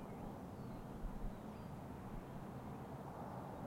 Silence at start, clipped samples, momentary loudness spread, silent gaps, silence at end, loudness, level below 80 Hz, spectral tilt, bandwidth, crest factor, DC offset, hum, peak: 0 s; under 0.1%; 2 LU; none; 0 s; -51 LUFS; -56 dBFS; -7.5 dB/octave; 16.5 kHz; 14 dB; under 0.1%; none; -34 dBFS